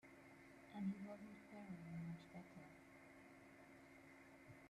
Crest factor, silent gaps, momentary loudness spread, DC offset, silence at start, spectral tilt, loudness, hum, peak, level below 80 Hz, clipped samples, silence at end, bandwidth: 18 dB; none; 15 LU; under 0.1%; 0.05 s; -7.5 dB/octave; -57 LUFS; none; -38 dBFS; -84 dBFS; under 0.1%; 0 s; 13.5 kHz